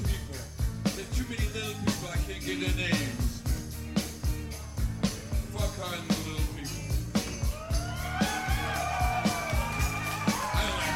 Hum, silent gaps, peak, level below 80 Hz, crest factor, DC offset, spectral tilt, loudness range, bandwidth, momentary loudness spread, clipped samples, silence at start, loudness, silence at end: none; none; -12 dBFS; -36 dBFS; 18 dB; under 0.1%; -4.5 dB/octave; 3 LU; 16.5 kHz; 6 LU; under 0.1%; 0 s; -31 LUFS; 0 s